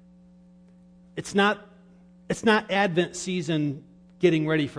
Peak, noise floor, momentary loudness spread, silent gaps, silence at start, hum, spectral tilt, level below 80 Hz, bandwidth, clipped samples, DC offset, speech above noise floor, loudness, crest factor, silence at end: -8 dBFS; -53 dBFS; 13 LU; none; 1.15 s; none; -5 dB/octave; -62 dBFS; 10.5 kHz; under 0.1%; under 0.1%; 29 dB; -25 LUFS; 20 dB; 0 s